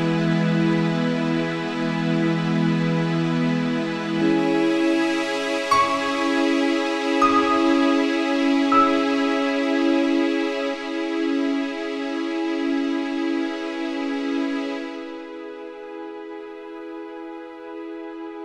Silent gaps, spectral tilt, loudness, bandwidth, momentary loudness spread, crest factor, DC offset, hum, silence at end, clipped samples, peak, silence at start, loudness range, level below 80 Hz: none; -6 dB/octave; -22 LUFS; 11.5 kHz; 16 LU; 16 dB; under 0.1%; none; 0 s; under 0.1%; -6 dBFS; 0 s; 10 LU; -62 dBFS